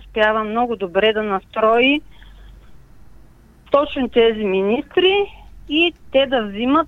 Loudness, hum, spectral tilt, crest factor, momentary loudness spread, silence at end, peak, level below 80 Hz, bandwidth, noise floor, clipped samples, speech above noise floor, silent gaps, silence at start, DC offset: -18 LUFS; none; -6.5 dB/octave; 16 dB; 6 LU; 0 s; -2 dBFS; -46 dBFS; 6.8 kHz; -47 dBFS; under 0.1%; 29 dB; none; 0 s; under 0.1%